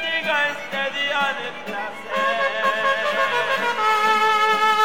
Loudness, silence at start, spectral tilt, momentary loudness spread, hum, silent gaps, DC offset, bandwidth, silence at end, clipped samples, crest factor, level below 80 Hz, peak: -20 LUFS; 0 s; -2 dB/octave; 11 LU; none; none; 0.8%; 18 kHz; 0 s; under 0.1%; 14 dB; -78 dBFS; -8 dBFS